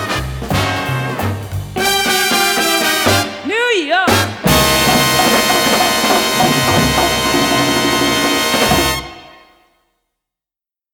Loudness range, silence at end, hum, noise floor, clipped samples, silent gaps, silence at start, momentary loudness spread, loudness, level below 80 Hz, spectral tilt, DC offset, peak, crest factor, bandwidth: 3 LU; 1.65 s; none; -89 dBFS; under 0.1%; none; 0 s; 8 LU; -13 LUFS; -34 dBFS; -3 dB/octave; under 0.1%; 0 dBFS; 14 dB; over 20 kHz